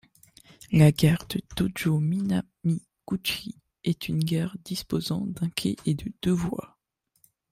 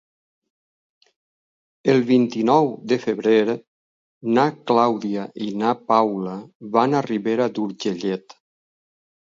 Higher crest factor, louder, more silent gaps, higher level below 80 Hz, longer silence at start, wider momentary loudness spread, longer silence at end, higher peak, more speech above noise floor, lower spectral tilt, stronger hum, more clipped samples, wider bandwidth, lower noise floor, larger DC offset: about the same, 22 dB vs 20 dB; second, -27 LUFS vs -21 LUFS; second, none vs 3.67-4.21 s, 6.55-6.60 s; first, -52 dBFS vs -70 dBFS; second, 0.7 s vs 1.85 s; first, 13 LU vs 10 LU; second, 0.85 s vs 1.05 s; second, -6 dBFS vs -2 dBFS; second, 40 dB vs over 70 dB; about the same, -6 dB/octave vs -6.5 dB/octave; neither; neither; first, 16 kHz vs 7.6 kHz; second, -66 dBFS vs under -90 dBFS; neither